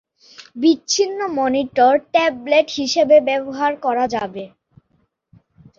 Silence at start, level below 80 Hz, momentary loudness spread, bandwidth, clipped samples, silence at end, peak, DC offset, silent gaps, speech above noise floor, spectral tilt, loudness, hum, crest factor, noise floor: 0.4 s; -60 dBFS; 11 LU; 7.6 kHz; under 0.1%; 1.3 s; -2 dBFS; under 0.1%; none; 48 dB; -3 dB/octave; -17 LUFS; none; 16 dB; -65 dBFS